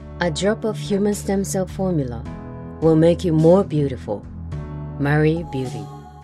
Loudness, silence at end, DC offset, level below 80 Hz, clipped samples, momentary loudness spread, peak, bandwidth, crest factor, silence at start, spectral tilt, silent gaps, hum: -20 LUFS; 0 s; under 0.1%; -40 dBFS; under 0.1%; 17 LU; -2 dBFS; 13.5 kHz; 18 dB; 0 s; -6.5 dB/octave; none; none